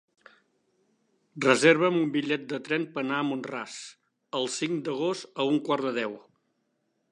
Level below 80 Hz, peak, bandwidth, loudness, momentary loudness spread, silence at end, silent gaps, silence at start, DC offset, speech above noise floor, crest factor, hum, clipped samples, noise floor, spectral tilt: -84 dBFS; -6 dBFS; 11 kHz; -27 LUFS; 15 LU; 0.9 s; none; 1.35 s; under 0.1%; 48 dB; 24 dB; none; under 0.1%; -75 dBFS; -4.5 dB/octave